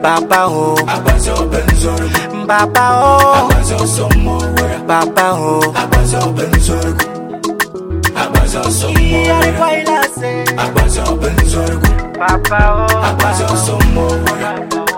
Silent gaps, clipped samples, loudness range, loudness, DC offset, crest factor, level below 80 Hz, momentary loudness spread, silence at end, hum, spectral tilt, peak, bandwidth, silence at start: none; under 0.1%; 3 LU; -12 LUFS; under 0.1%; 12 dB; -18 dBFS; 6 LU; 0 s; none; -4.5 dB/octave; 0 dBFS; 17.5 kHz; 0 s